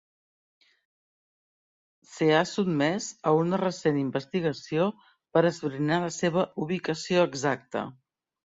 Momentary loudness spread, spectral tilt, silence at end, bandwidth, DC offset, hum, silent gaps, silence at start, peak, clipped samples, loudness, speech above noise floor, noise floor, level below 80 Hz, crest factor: 6 LU; -5.5 dB/octave; 0.55 s; 8 kHz; under 0.1%; none; none; 2.1 s; -8 dBFS; under 0.1%; -27 LUFS; over 64 dB; under -90 dBFS; -68 dBFS; 20 dB